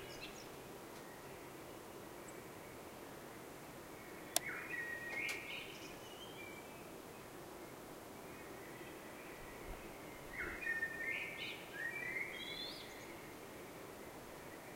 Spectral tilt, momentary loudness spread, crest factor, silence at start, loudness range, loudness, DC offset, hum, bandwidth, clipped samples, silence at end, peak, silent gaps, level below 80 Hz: -2.5 dB/octave; 12 LU; 36 dB; 0 s; 9 LU; -47 LUFS; under 0.1%; none; 16 kHz; under 0.1%; 0 s; -14 dBFS; none; -66 dBFS